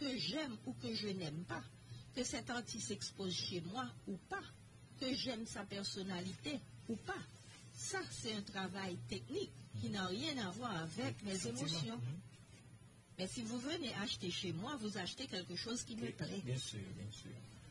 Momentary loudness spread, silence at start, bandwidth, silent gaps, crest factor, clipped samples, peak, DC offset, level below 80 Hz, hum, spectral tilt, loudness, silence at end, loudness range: 12 LU; 0 s; 11.5 kHz; none; 16 dB; under 0.1%; -30 dBFS; under 0.1%; -70 dBFS; none; -4 dB/octave; -44 LUFS; 0 s; 2 LU